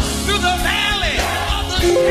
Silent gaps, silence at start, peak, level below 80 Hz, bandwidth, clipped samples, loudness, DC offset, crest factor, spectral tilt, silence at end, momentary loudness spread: none; 0 s; -4 dBFS; -26 dBFS; 15 kHz; under 0.1%; -17 LUFS; under 0.1%; 14 dB; -3.5 dB/octave; 0 s; 3 LU